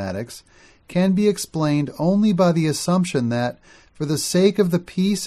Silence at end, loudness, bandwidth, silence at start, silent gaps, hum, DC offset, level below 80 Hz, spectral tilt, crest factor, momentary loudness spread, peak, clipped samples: 0 s; -20 LUFS; 15 kHz; 0 s; none; none; under 0.1%; -56 dBFS; -6 dB/octave; 16 dB; 11 LU; -4 dBFS; under 0.1%